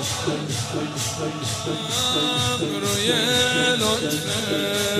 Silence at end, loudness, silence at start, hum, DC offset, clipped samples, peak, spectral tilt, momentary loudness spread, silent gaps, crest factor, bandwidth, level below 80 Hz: 0 s; -22 LUFS; 0 s; none; under 0.1%; under 0.1%; -6 dBFS; -3 dB/octave; 8 LU; none; 16 dB; 16 kHz; -54 dBFS